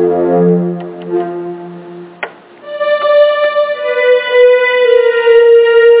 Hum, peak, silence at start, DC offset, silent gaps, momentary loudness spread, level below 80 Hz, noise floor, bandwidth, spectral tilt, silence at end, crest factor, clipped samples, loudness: none; 0 dBFS; 0 s; under 0.1%; none; 19 LU; -56 dBFS; -30 dBFS; 4 kHz; -9.5 dB/octave; 0 s; 10 dB; under 0.1%; -10 LUFS